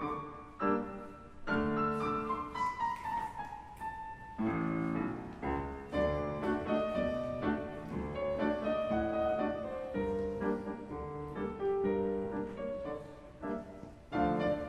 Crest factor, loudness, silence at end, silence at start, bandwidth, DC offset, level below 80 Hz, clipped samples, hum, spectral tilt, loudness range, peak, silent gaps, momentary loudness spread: 18 dB; -36 LUFS; 0 s; 0 s; 12.5 kHz; under 0.1%; -52 dBFS; under 0.1%; none; -8 dB/octave; 3 LU; -18 dBFS; none; 11 LU